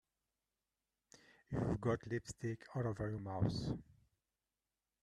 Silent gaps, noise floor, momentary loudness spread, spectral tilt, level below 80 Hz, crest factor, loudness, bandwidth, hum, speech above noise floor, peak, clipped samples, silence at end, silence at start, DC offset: none; under -90 dBFS; 7 LU; -7 dB/octave; -62 dBFS; 20 dB; -42 LUFS; 11 kHz; none; over 50 dB; -22 dBFS; under 0.1%; 1.2 s; 1.5 s; under 0.1%